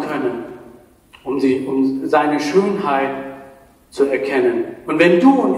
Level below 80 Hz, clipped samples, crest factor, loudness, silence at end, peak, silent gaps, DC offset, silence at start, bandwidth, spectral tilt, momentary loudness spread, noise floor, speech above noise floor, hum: -58 dBFS; under 0.1%; 18 dB; -17 LUFS; 0 s; 0 dBFS; none; under 0.1%; 0 s; 12 kHz; -6 dB/octave; 19 LU; -46 dBFS; 31 dB; none